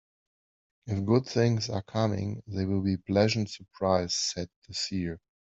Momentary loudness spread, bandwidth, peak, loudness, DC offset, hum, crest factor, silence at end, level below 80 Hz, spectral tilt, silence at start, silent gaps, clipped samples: 11 LU; 8.2 kHz; -10 dBFS; -29 LUFS; under 0.1%; none; 20 dB; 0.35 s; -62 dBFS; -5.5 dB/octave; 0.85 s; 4.56-4.62 s; under 0.1%